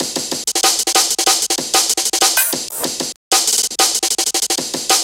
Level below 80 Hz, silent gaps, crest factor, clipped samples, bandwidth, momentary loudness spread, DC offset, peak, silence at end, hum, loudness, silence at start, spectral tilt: -58 dBFS; 3.16-3.31 s; 16 dB; under 0.1%; 17 kHz; 7 LU; under 0.1%; 0 dBFS; 0 s; none; -14 LUFS; 0 s; 1 dB/octave